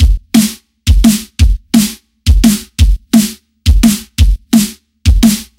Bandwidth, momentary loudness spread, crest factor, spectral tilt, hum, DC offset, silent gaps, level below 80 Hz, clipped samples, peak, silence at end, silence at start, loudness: 17 kHz; 8 LU; 10 dB; -5 dB/octave; none; under 0.1%; none; -14 dBFS; 1%; 0 dBFS; 0.15 s; 0 s; -12 LUFS